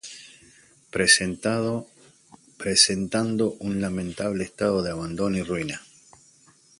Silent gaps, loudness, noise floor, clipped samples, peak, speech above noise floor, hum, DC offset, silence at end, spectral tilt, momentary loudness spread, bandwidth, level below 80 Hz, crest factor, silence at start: none; -24 LUFS; -57 dBFS; under 0.1%; -2 dBFS; 33 dB; none; under 0.1%; 1 s; -3 dB/octave; 15 LU; 11.5 kHz; -54 dBFS; 24 dB; 0.05 s